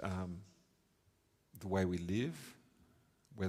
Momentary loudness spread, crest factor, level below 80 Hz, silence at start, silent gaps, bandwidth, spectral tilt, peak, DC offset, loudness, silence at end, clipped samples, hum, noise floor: 17 LU; 20 dB; -72 dBFS; 0 s; none; 15.5 kHz; -6.5 dB/octave; -22 dBFS; under 0.1%; -40 LUFS; 0 s; under 0.1%; none; -75 dBFS